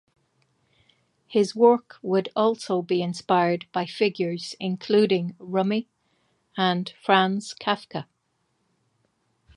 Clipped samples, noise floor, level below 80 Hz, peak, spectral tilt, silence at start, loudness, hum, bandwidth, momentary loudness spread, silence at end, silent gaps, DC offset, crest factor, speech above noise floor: under 0.1%; -73 dBFS; -72 dBFS; -2 dBFS; -6 dB/octave; 1.3 s; -24 LUFS; none; 11 kHz; 10 LU; 1.55 s; none; under 0.1%; 22 dB; 49 dB